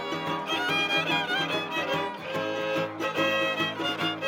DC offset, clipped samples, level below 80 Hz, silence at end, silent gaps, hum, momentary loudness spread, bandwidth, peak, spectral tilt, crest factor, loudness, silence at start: under 0.1%; under 0.1%; -76 dBFS; 0 s; none; none; 6 LU; 17 kHz; -14 dBFS; -4 dB/octave; 14 dB; -27 LUFS; 0 s